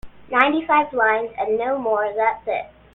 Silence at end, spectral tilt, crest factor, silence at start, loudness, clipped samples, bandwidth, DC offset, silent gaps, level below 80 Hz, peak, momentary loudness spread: 0.3 s; -6.5 dB/octave; 20 dB; 0.05 s; -20 LUFS; under 0.1%; 4.2 kHz; under 0.1%; none; -54 dBFS; 0 dBFS; 8 LU